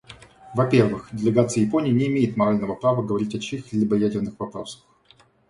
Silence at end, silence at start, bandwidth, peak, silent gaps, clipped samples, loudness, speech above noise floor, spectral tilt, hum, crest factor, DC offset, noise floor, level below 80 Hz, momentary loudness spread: 0.75 s; 0.1 s; 11.5 kHz; -4 dBFS; none; under 0.1%; -22 LUFS; 35 dB; -7 dB/octave; none; 20 dB; under 0.1%; -57 dBFS; -56 dBFS; 10 LU